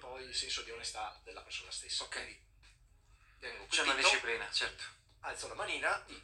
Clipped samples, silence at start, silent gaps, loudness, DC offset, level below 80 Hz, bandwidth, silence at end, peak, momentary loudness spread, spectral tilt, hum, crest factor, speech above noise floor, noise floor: under 0.1%; 0 s; none; -35 LUFS; under 0.1%; -64 dBFS; 16 kHz; 0 s; -14 dBFS; 19 LU; 0 dB/octave; none; 24 dB; 27 dB; -65 dBFS